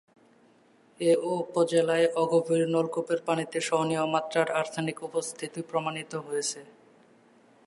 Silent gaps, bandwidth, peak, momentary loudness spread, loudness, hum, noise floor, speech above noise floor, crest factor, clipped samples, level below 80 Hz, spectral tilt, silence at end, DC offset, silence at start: none; 11.5 kHz; -12 dBFS; 9 LU; -28 LUFS; none; -61 dBFS; 34 dB; 18 dB; under 0.1%; -80 dBFS; -4.5 dB/octave; 0.95 s; under 0.1%; 1 s